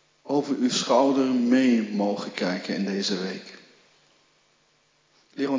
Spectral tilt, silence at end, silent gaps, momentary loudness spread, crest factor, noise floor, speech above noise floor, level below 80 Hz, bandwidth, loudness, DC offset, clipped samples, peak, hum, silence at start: -4.5 dB/octave; 0 s; none; 12 LU; 18 dB; -65 dBFS; 41 dB; -84 dBFS; 7.6 kHz; -24 LUFS; under 0.1%; under 0.1%; -8 dBFS; none; 0.25 s